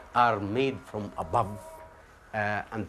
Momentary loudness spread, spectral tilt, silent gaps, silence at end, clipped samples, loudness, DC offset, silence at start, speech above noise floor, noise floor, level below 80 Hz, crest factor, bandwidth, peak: 17 LU; -6.5 dB/octave; none; 0 s; under 0.1%; -29 LUFS; under 0.1%; 0 s; 23 dB; -52 dBFS; -56 dBFS; 22 dB; 14 kHz; -8 dBFS